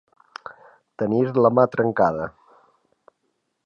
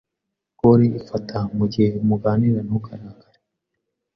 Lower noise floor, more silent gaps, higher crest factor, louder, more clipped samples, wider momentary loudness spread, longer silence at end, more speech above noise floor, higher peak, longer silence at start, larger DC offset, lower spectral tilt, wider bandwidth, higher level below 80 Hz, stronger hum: second, -73 dBFS vs -81 dBFS; neither; about the same, 20 dB vs 18 dB; about the same, -20 LUFS vs -20 LUFS; neither; first, 22 LU vs 12 LU; first, 1.35 s vs 1.05 s; second, 54 dB vs 62 dB; about the same, -4 dBFS vs -4 dBFS; first, 1 s vs 0.65 s; neither; about the same, -9.5 dB/octave vs -10 dB/octave; first, 7 kHz vs 6.2 kHz; second, -60 dBFS vs -50 dBFS; neither